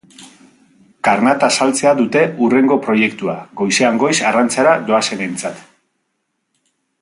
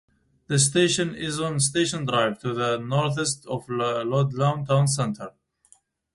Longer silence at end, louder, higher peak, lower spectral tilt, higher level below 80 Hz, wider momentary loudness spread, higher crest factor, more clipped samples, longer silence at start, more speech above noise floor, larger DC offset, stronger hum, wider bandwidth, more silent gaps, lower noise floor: first, 1.4 s vs 0.85 s; first, -14 LUFS vs -24 LUFS; first, 0 dBFS vs -6 dBFS; about the same, -3.5 dB/octave vs -4.5 dB/octave; about the same, -62 dBFS vs -60 dBFS; about the same, 9 LU vs 7 LU; about the same, 16 dB vs 18 dB; neither; second, 0.2 s vs 0.5 s; first, 56 dB vs 36 dB; neither; neither; about the same, 11.5 kHz vs 11.5 kHz; neither; first, -71 dBFS vs -60 dBFS